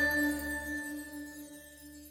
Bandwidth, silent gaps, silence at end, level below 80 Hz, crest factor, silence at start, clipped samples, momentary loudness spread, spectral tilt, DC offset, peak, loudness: 17 kHz; none; 0 s; -54 dBFS; 16 dB; 0 s; under 0.1%; 19 LU; -3.5 dB/octave; under 0.1%; -20 dBFS; -35 LUFS